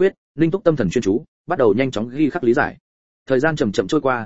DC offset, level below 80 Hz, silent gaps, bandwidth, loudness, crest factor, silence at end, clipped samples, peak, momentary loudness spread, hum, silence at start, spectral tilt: 0.9%; -48 dBFS; 0.18-0.35 s, 1.28-1.45 s, 2.80-3.26 s; 8 kHz; -19 LUFS; 18 dB; 0 s; under 0.1%; -2 dBFS; 5 LU; none; 0 s; -6.5 dB/octave